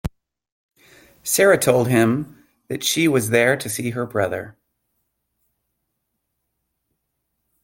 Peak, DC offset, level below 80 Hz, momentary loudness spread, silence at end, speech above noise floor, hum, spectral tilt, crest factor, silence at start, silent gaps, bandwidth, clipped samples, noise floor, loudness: -2 dBFS; under 0.1%; -50 dBFS; 17 LU; 3.1 s; 57 dB; none; -4 dB/octave; 20 dB; 0.05 s; 0.52-0.69 s; 17 kHz; under 0.1%; -76 dBFS; -19 LUFS